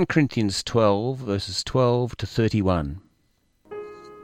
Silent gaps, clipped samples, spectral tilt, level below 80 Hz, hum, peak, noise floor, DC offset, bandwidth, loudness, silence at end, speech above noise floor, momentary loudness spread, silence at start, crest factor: none; under 0.1%; -6 dB/octave; -46 dBFS; none; -6 dBFS; -66 dBFS; under 0.1%; 15 kHz; -23 LUFS; 0 s; 44 dB; 17 LU; 0 s; 18 dB